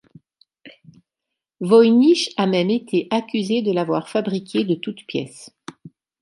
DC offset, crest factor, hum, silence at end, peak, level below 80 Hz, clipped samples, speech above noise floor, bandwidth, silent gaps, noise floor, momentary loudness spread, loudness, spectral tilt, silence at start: under 0.1%; 18 dB; none; 0.35 s; -2 dBFS; -72 dBFS; under 0.1%; 65 dB; 11.5 kHz; none; -83 dBFS; 20 LU; -19 LUFS; -6 dB/octave; 0.65 s